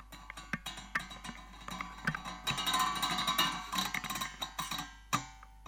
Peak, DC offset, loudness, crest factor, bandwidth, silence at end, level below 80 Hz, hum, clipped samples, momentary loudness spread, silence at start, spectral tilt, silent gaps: -16 dBFS; under 0.1%; -35 LUFS; 22 dB; over 20 kHz; 0 s; -56 dBFS; none; under 0.1%; 15 LU; 0 s; -2 dB/octave; none